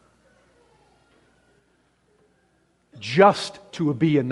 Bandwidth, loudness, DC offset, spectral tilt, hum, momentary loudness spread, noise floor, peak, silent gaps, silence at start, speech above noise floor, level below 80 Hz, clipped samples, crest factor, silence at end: 11.5 kHz; -21 LUFS; under 0.1%; -6.5 dB/octave; none; 15 LU; -65 dBFS; -2 dBFS; none; 2.95 s; 45 dB; -66 dBFS; under 0.1%; 24 dB; 0 s